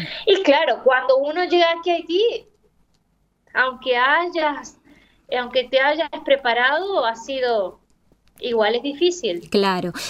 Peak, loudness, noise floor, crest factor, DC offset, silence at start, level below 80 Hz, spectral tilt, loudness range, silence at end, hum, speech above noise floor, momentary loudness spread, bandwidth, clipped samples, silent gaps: -4 dBFS; -19 LUFS; -65 dBFS; 18 dB; under 0.1%; 0 s; -60 dBFS; -3.5 dB/octave; 3 LU; 0 s; none; 46 dB; 8 LU; 14 kHz; under 0.1%; none